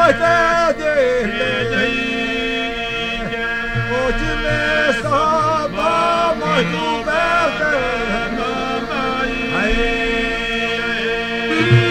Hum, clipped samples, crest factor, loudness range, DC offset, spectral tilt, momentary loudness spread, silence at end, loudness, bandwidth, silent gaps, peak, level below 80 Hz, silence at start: none; under 0.1%; 18 dB; 2 LU; under 0.1%; -5 dB/octave; 6 LU; 0 s; -17 LUFS; 15.5 kHz; none; 0 dBFS; -32 dBFS; 0 s